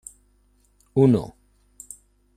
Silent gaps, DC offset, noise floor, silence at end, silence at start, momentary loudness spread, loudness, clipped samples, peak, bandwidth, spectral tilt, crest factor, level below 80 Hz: none; under 0.1%; -62 dBFS; 1.1 s; 0.95 s; 25 LU; -21 LUFS; under 0.1%; -6 dBFS; 14.5 kHz; -8.5 dB/octave; 20 dB; -56 dBFS